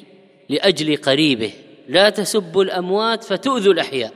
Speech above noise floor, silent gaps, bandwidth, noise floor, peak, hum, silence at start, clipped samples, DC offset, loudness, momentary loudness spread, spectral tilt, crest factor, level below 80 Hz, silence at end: 29 dB; none; 15 kHz; -46 dBFS; 0 dBFS; none; 0.5 s; under 0.1%; under 0.1%; -17 LUFS; 6 LU; -4 dB/octave; 18 dB; -62 dBFS; 0 s